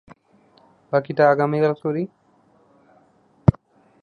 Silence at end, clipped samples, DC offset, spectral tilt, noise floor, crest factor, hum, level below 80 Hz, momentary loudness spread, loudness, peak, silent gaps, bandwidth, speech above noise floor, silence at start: 0.5 s; under 0.1%; under 0.1%; -9.5 dB/octave; -58 dBFS; 22 dB; none; -44 dBFS; 9 LU; -21 LUFS; 0 dBFS; none; 6.6 kHz; 39 dB; 0.9 s